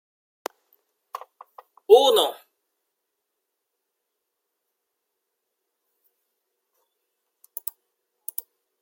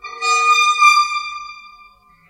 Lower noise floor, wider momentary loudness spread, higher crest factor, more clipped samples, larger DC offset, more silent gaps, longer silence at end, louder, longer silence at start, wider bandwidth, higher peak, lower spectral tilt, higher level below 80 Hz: first, -81 dBFS vs -48 dBFS; first, 25 LU vs 19 LU; first, 26 dB vs 18 dB; neither; neither; neither; first, 6.5 s vs 0.6 s; second, -20 LUFS vs -13 LUFS; first, 1.9 s vs 0.05 s; first, 16.5 kHz vs 14 kHz; about the same, -2 dBFS vs 0 dBFS; first, -0.5 dB/octave vs 4 dB/octave; second, -84 dBFS vs -62 dBFS